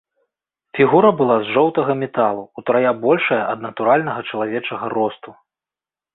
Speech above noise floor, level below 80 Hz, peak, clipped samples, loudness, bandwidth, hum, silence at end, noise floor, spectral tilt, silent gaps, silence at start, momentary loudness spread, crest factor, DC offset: over 73 dB; -62 dBFS; -2 dBFS; under 0.1%; -18 LUFS; 4.1 kHz; none; 0.8 s; under -90 dBFS; -11 dB/octave; none; 0.75 s; 10 LU; 18 dB; under 0.1%